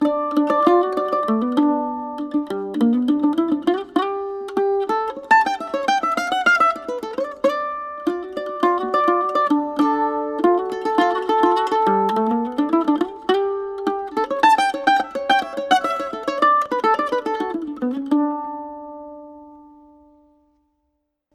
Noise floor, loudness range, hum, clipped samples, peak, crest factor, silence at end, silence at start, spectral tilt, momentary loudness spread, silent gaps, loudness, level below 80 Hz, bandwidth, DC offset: -73 dBFS; 3 LU; none; under 0.1%; -2 dBFS; 18 dB; 1.75 s; 0 s; -4.5 dB/octave; 10 LU; none; -20 LUFS; -62 dBFS; 13 kHz; under 0.1%